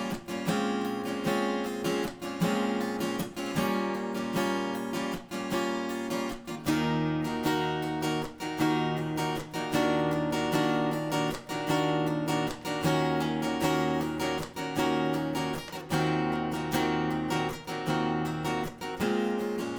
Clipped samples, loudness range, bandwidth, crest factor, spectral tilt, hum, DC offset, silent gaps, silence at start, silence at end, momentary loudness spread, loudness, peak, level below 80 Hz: under 0.1%; 2 LU; over 20 kHz; 16 dB; -5.5 dB/octave; none; under 0.1%; none; 0 s; 0 s; 6 LU; -30 LUFS; -14 dBFS; -56 dBFS